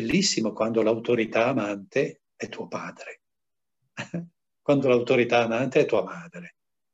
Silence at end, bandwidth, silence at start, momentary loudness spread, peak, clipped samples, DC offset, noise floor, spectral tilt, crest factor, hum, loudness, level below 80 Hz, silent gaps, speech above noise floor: 0.45 s; 8.6 kHz; 0 s; 18 LU; -8 dBFS; under 0.1%; under 0.1%; -90 dBFS; -4.5 dB/octave; 18 dB; none; -24 LUFS; -64 dBFS; none; 65 dB